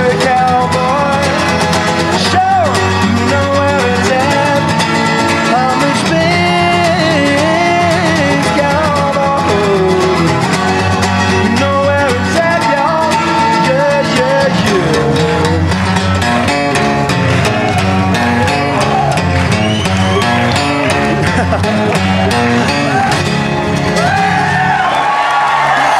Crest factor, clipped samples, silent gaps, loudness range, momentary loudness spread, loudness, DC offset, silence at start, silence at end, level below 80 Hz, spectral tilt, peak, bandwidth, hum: 10 dB; under 0.1%; none; 1 LU; 2 LU; -11 LUFS; under 0.1%; 0 s; 0 s; -36 dBFS; -5 dB/octave; 0 dBFS; 15 kHz; none